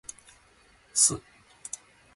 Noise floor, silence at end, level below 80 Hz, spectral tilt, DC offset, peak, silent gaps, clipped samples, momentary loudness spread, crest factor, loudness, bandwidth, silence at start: -60 dBFS; 0.95 s; -62 dBFS; -1 dB/octave; under 0.1%; -8 dBFS; none; under 0.1%; 22 LU; 24 dB; -23 LUFS; 12 kHz; 0.95 s